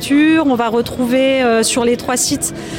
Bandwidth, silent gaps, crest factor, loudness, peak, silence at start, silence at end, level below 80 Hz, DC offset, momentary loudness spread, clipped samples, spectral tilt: 17 kHz; none; 10 dB; -14 LUFS; -4 dBFS; 0 s; 0 s; -44 dBFS; under 0.1%; 5 LU; under 0.1%; -3 dB/octave